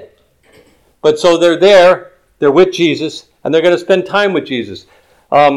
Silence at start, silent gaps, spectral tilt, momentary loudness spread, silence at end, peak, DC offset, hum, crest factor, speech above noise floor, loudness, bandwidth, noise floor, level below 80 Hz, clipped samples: 0 s; none; -5 dB/octave; 14 LU; 0 s; 0 dBFS; under 0.1%; none; 12 dB; 39 dB; -11 LUFS; 12 kHz; -49 dBFS; -54 dBFS; under 0.1%